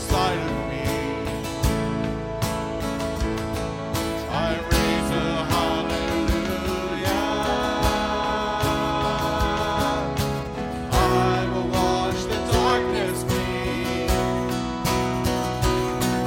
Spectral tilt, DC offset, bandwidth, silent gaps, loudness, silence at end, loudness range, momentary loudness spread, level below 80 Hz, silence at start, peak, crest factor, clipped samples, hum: -5 dB/octave; under 0.1%; 17 kHz; none; -24 LUFS; 0 s; 4 LU; 6 LU; -34 dBFS; 0 s; -6 dBFS; 18 dB; under 0.1%; none